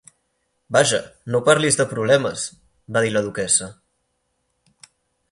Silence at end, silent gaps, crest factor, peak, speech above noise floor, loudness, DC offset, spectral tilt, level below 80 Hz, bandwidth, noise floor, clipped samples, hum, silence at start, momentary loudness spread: 1.6 s; none; 22 dB; 0 dBFS; 52 dB; -19 LUFS; under 0.1%; -3 dB/octave; -58 dBFS; 11.5 kHz; -71 dBFS; under 0.1%; none; 0.7 s; 9 LU